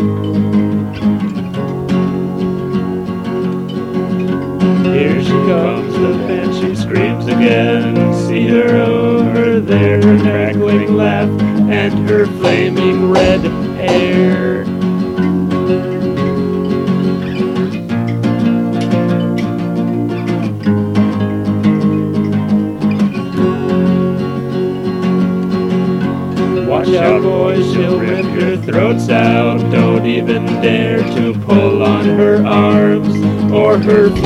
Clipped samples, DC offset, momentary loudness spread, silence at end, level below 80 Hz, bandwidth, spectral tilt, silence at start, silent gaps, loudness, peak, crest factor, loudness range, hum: under 0.1%; under 0.1%; 7 LU; 0 s; -42 dBFS; 11.5 kHz; -8 dB/octave; 0 s; none; -13 LUFS; 0 dBFS; 12 dB; 4 LU; none